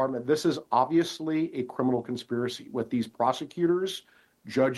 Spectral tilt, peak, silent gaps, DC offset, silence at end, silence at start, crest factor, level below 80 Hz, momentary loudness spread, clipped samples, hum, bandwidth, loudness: -5.5 dB/octave; -10 dBFS; none; under 0.1%; 0 s; 0 s; 18 dB; -70 dBFS; 7 LU; under 0.1%; none; 12.5 kHz; -28 LUFS